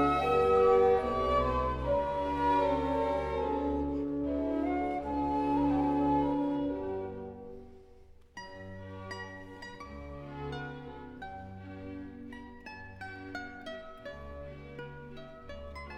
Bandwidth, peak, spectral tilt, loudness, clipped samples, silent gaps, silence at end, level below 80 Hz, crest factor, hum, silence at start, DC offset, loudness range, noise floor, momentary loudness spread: 9.2 kHz; -14 dBFS; -7.5 dB/octave; -31 LUFS; under 0.1%; none; 0 s; -48 dBFS; 18 dB; none; 0 s; under 0.1%; 16 LU; -55 dBFS; 19 LU